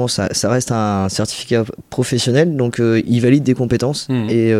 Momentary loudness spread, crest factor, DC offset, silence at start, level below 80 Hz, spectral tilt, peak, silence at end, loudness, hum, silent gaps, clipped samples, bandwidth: 6 LU; 14 dB; under 0.1%; 0 s; -46 dBFS; -5.5 dB/octave; 0 dBFS; 0 s; -16 LUFS; none; none; under 0.1%; 15.5 kHz